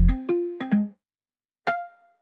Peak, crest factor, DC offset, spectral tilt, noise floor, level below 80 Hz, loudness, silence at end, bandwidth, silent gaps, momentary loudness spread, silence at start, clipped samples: -10 dBFS; 16 dB; under 0.1%; -9.5 dB/octave; under -90 dBFS; -30 dBFS; -27 LUFS; 0.35 s; 4.7 kHz; 1.45-1.49 s; 9 LU; 0 s; under 0.1%